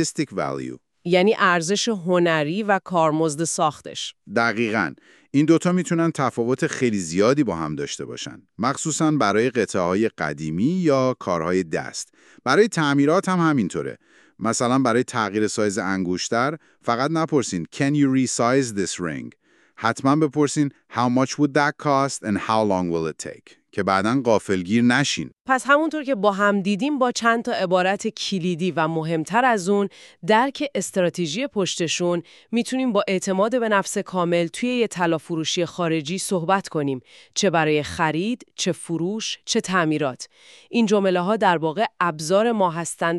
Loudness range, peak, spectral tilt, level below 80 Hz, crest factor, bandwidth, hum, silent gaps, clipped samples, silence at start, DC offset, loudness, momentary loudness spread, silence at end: 2 LU; -4 dBFS; -4.5 dB/octave; -62 dBFS; 18 dB; 13 kHz; none; none; under 0.1%; 0 s; under 0.1%; -22 LUFS; 9 LU; 0 s